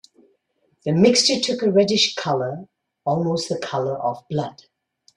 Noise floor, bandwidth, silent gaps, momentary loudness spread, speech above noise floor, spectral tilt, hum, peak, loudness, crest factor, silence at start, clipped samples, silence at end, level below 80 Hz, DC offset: -67 dBFS; 12 kHz; none; 14 LU; 47 dB; -4 dB/octave; none; -4 dBFS; -20 LUFS; 18 dB; 0.85 s; under 0.1%; 0.65 s; -62 dBFS; under 0.1%